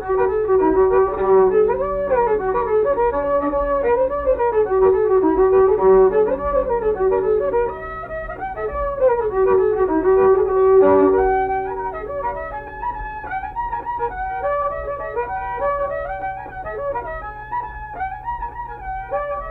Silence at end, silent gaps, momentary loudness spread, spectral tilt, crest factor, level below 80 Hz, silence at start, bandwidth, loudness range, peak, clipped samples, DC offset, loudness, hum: 0 s; none; 14 LU; -10 dB/octave; 14 dB; -38 dBFS; 0 s; 3.8 kHz; 9 LU; -6 dBFS; under 0.1%; under 0.1%; -19 LUFS; none